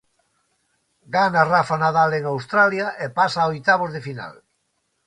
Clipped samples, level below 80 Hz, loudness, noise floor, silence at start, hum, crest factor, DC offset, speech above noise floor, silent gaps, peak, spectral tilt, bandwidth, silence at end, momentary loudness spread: under 0.1%; -60 dBFS; -19 LUFS; -71 dBFS; 1.1 s; none; 18 dB; under 0.1%; 52 dB; none; -2 dBFS; -5.5 dB/octave; 11 kHz; 0.75 s; 12 LU